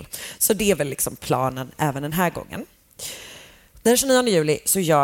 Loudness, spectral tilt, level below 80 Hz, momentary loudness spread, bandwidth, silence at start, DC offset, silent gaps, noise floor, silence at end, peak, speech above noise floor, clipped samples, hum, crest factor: -21 LUFS; -3.5 dB/octave; -50 dBFS; 17 LU; 17 kHz; 0 s; under 0.1%; none; -47 dBFS; 0 s; -6 dBFS; 26 dB; under 0.1%; none; 16 dB